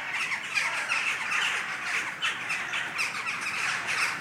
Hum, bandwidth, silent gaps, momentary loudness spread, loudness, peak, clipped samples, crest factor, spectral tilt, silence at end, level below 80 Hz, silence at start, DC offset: none; 16.5 kHz; none; 3 LU; -28 LUFS; -14 dBFS; under 0.1%; 18 dB; 0 dB/octave; 0 s; -76 dBFS; 0 s; under 0.1%